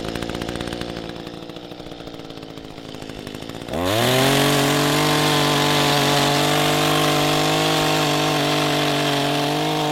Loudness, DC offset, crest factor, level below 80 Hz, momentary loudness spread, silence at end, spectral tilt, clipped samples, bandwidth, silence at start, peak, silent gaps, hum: -18 LUFS; under 0.1%; 16 dB; -46 dBFS; 18 LU; 0 s; -4 dB/octave; under 0.1%; 16.5 kHz; 0 s; -4 dBFS; none; none